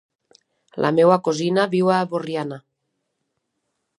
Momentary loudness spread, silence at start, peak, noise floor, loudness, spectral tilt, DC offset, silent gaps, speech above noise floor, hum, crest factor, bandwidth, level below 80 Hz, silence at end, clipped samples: 16 LU; 0.75 s; -2 dBFS; -76 dBFS; -20 LUFS; -6 dB/octave; under 0.1%; none; 57 dB; none; 20 dB; 11.5 kHz; -70 dBFS; 1.4 s; under 0.1%